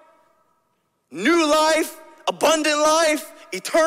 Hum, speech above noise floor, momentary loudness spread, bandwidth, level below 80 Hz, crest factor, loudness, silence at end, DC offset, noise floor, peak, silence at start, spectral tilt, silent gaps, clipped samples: none; 50 dB; 13 LU; 16 kHz; -64 dBFS; 16 dB; -19 LUFS; 0 s; under 0.1%; -69 dBFS; -4 dBFS; 1.1 s; -1.5 dB/octave; none; under 0.1%